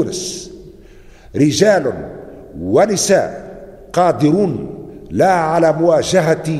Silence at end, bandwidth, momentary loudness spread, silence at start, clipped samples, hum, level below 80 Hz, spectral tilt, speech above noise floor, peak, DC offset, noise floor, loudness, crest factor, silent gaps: 0 s; 14 kHz; 19 LU; 0 s; under 0.1%; none; -44 dBFS; -5 dB/octave; 26 dB; 0 dBFS; under 0.1%; -40 dBFS; -15 LUFS; 16 dB; none